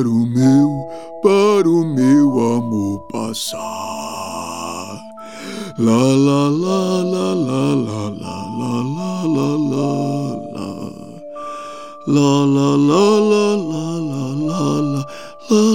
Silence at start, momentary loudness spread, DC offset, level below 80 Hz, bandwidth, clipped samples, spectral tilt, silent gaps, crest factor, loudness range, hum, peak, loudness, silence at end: 0 s; 16 LU; 0.6%; -62 dBFS; 16 kHz; under 0.1%; -6.5 dB/octave; none; 16 dB; 6 LU; none; -2 dBFS; -17 LUFS; 0 s